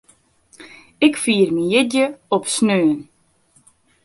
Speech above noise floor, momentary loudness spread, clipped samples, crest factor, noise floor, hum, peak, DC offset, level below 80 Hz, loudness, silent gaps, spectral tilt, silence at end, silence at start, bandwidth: 41 dB; 4 LU; under 0.1%; 18 dB; -58 dBFS; none; -2 dBFS; under 0.1%; -62 dBFS; -18 LUFS; none; -4 dB/octave; 1 s; 0.6 s; 11.5 kHz